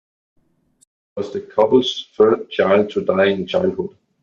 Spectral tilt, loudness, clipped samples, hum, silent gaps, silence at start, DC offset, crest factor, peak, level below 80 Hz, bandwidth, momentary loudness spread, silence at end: -6 dB/octave; -18 LUFS; under 0.1%; none; none; 1.15 s; under 0.1%; 16 dB; -2 dBFS; -60 dBFS; 7.2 kHz; 13 LU; 0.35 s